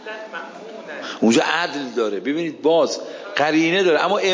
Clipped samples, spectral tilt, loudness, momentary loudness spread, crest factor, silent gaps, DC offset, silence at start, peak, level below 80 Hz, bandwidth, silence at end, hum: under 0.1%; -4 dB/octave; -19 LUFS; 16 LU; 16 dB; none; under 0.1%; 0 s; -4 dBFS; -72 dBFS; 7.6 kHz; 0 s; none